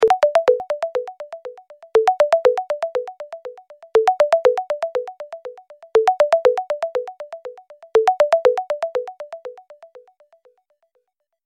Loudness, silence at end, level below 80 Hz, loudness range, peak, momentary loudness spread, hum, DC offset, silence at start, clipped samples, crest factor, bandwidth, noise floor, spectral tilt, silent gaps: -19 LUFS; 1.45 s; -64 dBFS; 3 LU; -4 dBFS; 20 LU; none; under 0.1%; 0 s; under 0.1%; 16 dB; 12 kHz; -70 dBFS; -2.5 dB/octave; none